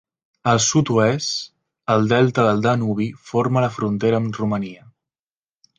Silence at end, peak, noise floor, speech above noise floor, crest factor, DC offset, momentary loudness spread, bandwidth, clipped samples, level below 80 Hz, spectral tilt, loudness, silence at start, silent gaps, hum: 1.05 s; -2 dBFS; under -90 dBFS; over 71 dB; 18 dB; under 0.1%; 10 LU; 9.8 kHz; under 0.1%; -56 dBFS; -5 dB/octave; -19 LUFS; 0.45 s; none; none